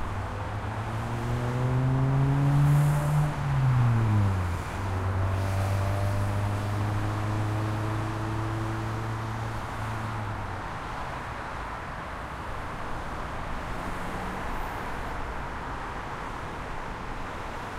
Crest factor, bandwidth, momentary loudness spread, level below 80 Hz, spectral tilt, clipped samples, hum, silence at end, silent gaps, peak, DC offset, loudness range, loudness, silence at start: 14 dB; 15 kHz; 12 LU; -40 dBFS; -7 dB/octave; under 0.1%; none; 0 s; none; -14 dBFS; under 0.1%; 10 LU; -30 LUFS; 0 s